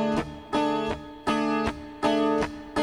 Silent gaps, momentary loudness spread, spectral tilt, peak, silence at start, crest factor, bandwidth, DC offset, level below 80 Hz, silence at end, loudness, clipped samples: none; 7 LU; -5.5 dB/octave; -10 dBFS; 0 s; 16 dB; 11.5 kHz; under 0.1%; -48 dBFS; 0 s; -27 LUFS; under 0.1%